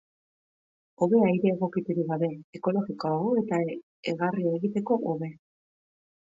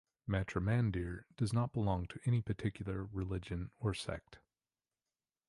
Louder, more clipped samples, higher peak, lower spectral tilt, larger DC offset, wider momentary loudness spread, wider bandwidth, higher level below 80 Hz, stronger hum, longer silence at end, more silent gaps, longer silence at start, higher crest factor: first, -28 LUFS vs -38 LUFS; neither; first, -10 dBFS vs -20 dBFS; first, -8.5 dB/octave vs -7 dB/octave; neither; about the same, 10 LU vs 8 LU; second, 7.8 kHz vs 11.5 kHz; second, -74 dBFS vs -52 dBFS; neither; about the same, 1.05 s vs 1.1 s; first, 2.44-2.53 s, 3.83-4.03 s vs none; first, 1 s vs 0.25 s; about the same, 18 dB vs 18 dB